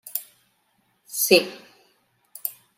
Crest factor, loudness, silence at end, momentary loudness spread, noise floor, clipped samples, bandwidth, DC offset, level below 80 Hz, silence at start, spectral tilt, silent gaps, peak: 24 dB; -22 LUFS; 0.25 s; 17 LU; -68 dBFS; under 0.1%; 16 kHz; under 0.1%; -78 dBFS; 0.05 s; -2 dB/octave; none; -2 dBFS